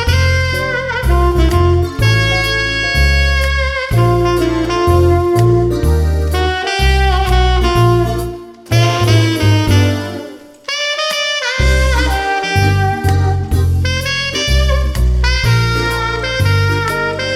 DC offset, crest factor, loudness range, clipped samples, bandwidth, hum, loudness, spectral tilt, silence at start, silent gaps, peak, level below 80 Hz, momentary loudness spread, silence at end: under 0.1%; 12 dB; 2 LU; under 0.1%; 15.5 kHz; none; -13 LUFS; -5.5 dB/octave; 0 s; none; 0 dBFS; -18 dBFS; 5 LU; 0 s